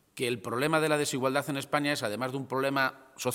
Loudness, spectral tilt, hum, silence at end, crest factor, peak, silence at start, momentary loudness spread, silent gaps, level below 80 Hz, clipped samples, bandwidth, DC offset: -30 LUFS; -4 dB/octave; none; 0 s; 20 dB; -10 dBFS; 0.15 s; 6 LU; none; -74 dBFS; under 0.1%; 17 kHz; under 0.1%